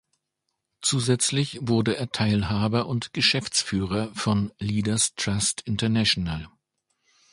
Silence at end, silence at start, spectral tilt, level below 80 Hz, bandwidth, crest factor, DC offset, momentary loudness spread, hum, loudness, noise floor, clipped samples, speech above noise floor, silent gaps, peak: 0.85 s; 0.8 s; -4 dB/octave; -48 dBFS; 11.5 kHz; 20 dB; under 0.1%; 6 LU; none; -24 LUFS; -80 dBFS; under 0.1%; 56 dB; none; -6 dBFS